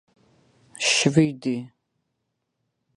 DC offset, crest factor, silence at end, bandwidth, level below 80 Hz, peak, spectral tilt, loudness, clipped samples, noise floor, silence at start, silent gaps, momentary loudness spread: under 0.1%; 22 dB; 1.3 s; 11.5 kHz; -62 dBFS; -4 dBFS; -4 dB/octave; -22 LUFS; under 0.1%; -78 dBFS; 0.8 s; none; 11 LU